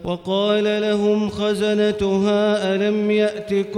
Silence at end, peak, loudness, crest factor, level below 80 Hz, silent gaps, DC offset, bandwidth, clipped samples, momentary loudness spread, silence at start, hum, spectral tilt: 0 s; -6 dBFS; -19 LUFS; 12 dB; -52 dBFS; none; under 0.1%; 11.5 kHz; under 0.1%; 3 LU; 0 s; none; -6 dB/octave